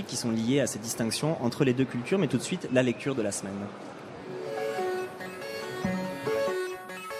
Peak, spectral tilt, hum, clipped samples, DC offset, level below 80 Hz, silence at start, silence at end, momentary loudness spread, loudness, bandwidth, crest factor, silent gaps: -10 dBFS; -5 dB/octave; none; under 0.1%; under 0.1%; -66 dBFS; 0 s; 0 s; 12 LU; -30 LUFS; 14.5 kHz; 20 dB; none